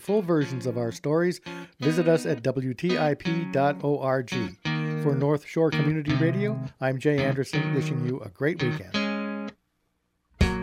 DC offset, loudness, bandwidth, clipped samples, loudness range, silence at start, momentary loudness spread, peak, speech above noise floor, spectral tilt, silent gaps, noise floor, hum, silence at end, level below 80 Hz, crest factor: under 0.1%; -26 LUFS; 15 kHz; under 0.1%; 2 LU; 0 s; 6 LU; -8 dBFS; 49 dB; -7 dB/octave; none; -74 dBFS; none; 0 s; -46 dBFS; 18 dB